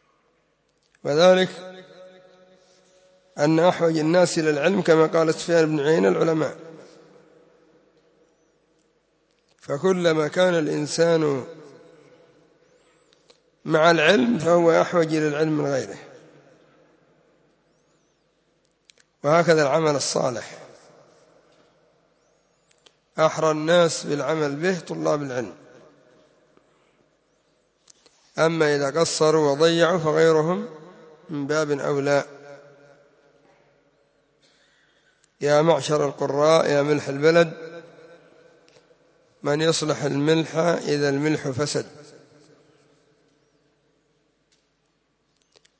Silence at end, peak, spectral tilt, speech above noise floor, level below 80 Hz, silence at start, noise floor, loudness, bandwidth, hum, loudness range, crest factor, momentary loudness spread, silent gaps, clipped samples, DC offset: 3.75 s; -4 dBFS; -5 dB/octave; 49 dB; -70 dBFS; 1.05 s; -69 dBFS; -21 LUFS; 8 kHz; none; 10 LU; 18 dB; 14 LU; none; under 0.1%; under 0.1%